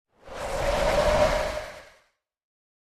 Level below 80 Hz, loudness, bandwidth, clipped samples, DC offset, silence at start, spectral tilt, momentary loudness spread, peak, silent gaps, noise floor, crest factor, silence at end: -38 dBFS; -25 LUFS; 14 kHz; under 0.1%; under 0.1%; 0.25 s; -4 dB/octave; 20 LU; -8 dBFS; none; -66 dBFS; 18 dB; 1.05 s